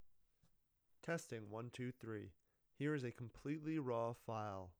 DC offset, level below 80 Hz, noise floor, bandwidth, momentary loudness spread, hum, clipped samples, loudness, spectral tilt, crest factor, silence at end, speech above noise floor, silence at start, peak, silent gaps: under 0.1%; -78 dBFS; -79 dBFS; over 20 kHz; 8 LU; none; under 0.1%; -47 LUFS; -6.5 dB/octave; 16 dB; 0.1 s; 33 dB; 0 s; -30 dBFS; none